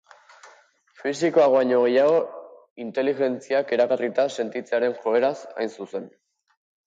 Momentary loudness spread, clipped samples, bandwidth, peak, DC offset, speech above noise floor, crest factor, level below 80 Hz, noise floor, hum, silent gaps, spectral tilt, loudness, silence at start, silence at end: 15 LU; under 0.1%; 7.8 kHz; -6 dBFS; under 0.1%; 34 dB; 16 dB; -76 dBFS; -56 dBFS; none; 2.71-2.76 s; -5 dB/octave; -23 LUFS; 0.45 s; 0.8 s